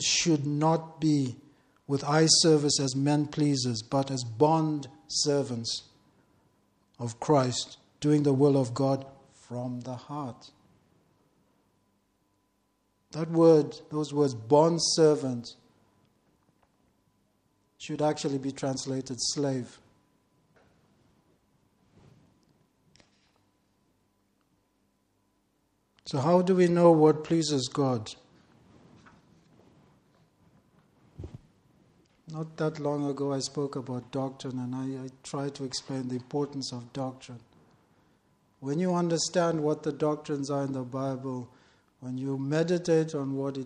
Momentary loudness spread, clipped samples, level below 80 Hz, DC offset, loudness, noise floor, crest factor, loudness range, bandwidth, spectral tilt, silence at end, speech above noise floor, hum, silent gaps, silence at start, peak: 17 LU; under 0.1%; -68 dBFS; under 0.1%; -28 LUFS; -73 dBFS; 22 dB; 12 LU; 10.5 kHz; -5 dB/octave; 0 s; 46 dB; none; none; 0 s; -8 dBFS